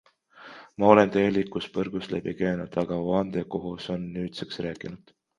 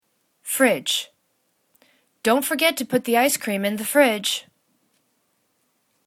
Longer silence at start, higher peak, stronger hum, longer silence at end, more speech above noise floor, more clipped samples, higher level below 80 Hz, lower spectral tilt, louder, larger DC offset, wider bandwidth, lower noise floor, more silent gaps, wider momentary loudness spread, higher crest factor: about the same, 0.35 s vs 0.45 s; about the same, 0 dBFS vs -2 dBFS; neither; second, 0.4 s vs 1.65 s; second, 24 dB vs 49 dB; neither; first, -56 dBFS vs -70 dBFS; first, -7.5 dB/octave vs -2.5 dB/octave; second, -26 LUFS vs -21 LUFS; neither; second, 11 kHz vs 19 kHz; second, -50 dBFS vs -69 dBFS; neither; first, 17 LU vs 9 LU; about the same, 26 dB vs 22 dB